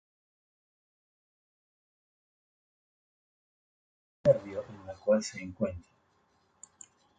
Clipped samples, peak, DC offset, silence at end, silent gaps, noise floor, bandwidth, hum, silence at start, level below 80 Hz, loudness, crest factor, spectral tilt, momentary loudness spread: under 0.1%; -12 dBFS; under 0.1%; 1.4 s; none; -71 dBFS; 9 kHz; none; 4.25 s; -62 dBFS; -31 LUFS; 26 dB; -6 dB/octave; 22 LU